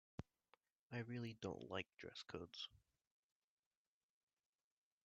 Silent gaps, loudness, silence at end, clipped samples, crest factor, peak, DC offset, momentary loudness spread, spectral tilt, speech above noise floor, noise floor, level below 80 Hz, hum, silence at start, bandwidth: 0.72-0.90 s; -52 LUFS; 2.25 s; under 0.1%; 24 dB; -30 dBFS; under 0.1%; 9 LU; -4 dB/octave; over 38 dB; under -90 dBFS; -80 dBFS; none; 0.2 s; 7.4 kHz